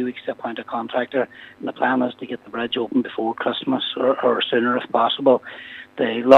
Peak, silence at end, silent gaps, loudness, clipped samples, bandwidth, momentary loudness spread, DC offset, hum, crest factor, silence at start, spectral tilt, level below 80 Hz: 0 dBFS; 0 s; none; -22 LUFS; under 0.1%; 6.6 kHz; 12 LU; under 0.1%; none; 20 dB; 0 s; -6 dB/octave; -68 dBFS